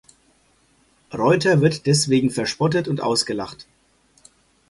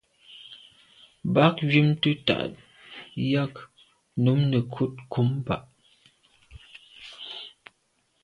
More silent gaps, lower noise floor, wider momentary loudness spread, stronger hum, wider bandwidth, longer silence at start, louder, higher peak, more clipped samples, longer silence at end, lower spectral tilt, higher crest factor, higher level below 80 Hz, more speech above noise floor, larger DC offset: neither; second, -60 dBFS vs -70 dBFS; second, 10 LU vs 24 LU; neither; first, 11.5 kHz vs 9.8 kHz; first, 1.1 s vs 0.3 s; first, -20 LUFS vs -25 LUFS; about the same, -4 dBFS vs -4 dBFS; neither; first, 1.1 s vs 0.75 s; second, -5 dB/octave vs -8 dB/octave; second, 18 dB vs 24 dB; about the same, -56 dBFS vs -58 dBFS; second, 41 dB vs 47 dB; neither